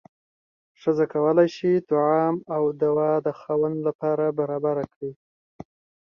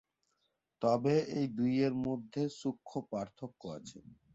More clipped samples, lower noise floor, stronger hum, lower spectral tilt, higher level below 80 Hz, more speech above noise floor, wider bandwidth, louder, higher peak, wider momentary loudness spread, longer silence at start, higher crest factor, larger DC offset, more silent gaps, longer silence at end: neither; first, under -90 dBFS vs -81 dBFS; neither; first, -8.5 dB/octave vs -7 dB/octave; about the same, -68 dBFS vs -70 dBFS; first, over 67 dB vs 47 dB; second, 6.8 kHz vs 8 kHz; first, -23 LUFS vs -35 LUFS; first, -6 dBFS vs -18 dBFS; second, 7 LU vs 15 LU; about the same, 0.85 s vs 0.8 s; about the same, 18 dB vs 18 dB; neither; first, 3.95-3.99 s, 4.96-5.01 s vs none; first, 1 s vs 0.2 s